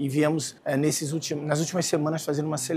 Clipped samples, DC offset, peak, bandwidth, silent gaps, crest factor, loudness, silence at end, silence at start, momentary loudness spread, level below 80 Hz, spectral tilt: under 0.1%; under 0.1%; -8 dBFS; 15.5 kHz; none; 18 dB; -26 LUFS; 0 s; 0 s; 4 LU; -70 dBFS; -5 dB/octave